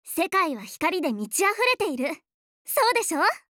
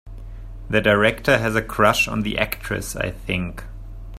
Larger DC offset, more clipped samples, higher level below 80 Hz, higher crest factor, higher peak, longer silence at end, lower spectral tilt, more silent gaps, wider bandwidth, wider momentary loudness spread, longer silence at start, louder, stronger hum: neither; neither; second, -70 dBFS vs -36 dBFS; about the same, 16 dB vs 20 dB; second, -8 dBFS vs 0 dBFS; first, 0.2 s vs 0 s; second, -2 dB/octave vs -4.5 dB/octave; first, 2.34-2.65 s vs none; first, over 20 kHz vs 16 kHz; second, 9 LU vs 22 LU; about the same, 0.05 s vs 0.05 s; second, -24 LUFS vs -20 LUFS; neither